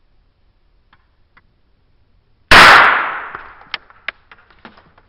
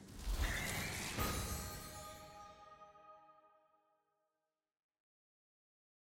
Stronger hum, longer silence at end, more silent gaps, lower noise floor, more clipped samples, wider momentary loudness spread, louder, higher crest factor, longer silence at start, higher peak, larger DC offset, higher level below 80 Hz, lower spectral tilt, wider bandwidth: neither; second, 1.8 s vs 2.55 s; neither; second, -56 dBFS vs under -90 dBFS; first, 0.6% vs under 0.1%; first, 26 LU vs 20 LU; first, -7 LUFS vs -42 LUFS; about the same, 16 dB vs 20 dB; first, 2.5 s vs 0 s; first, 0 dBFS vs -26 dBFS; neither; first, -36 dBFS vs -50 dBFS; about the same, -2 dB/octave vs -3 dB/octave; first, over 20 kHz vs 16.5 kHz